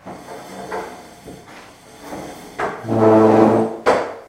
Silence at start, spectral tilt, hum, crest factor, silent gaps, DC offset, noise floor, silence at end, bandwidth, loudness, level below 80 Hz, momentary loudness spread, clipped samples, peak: 0.05 s; -7 dB/octave; none; 18 dB; none; under 0.1%; -41 dBFS; 0.05 s; 15.5 kHz; -16 LUFS; -54 dBFS; 26 LU; under 0.1%; 0 dBFS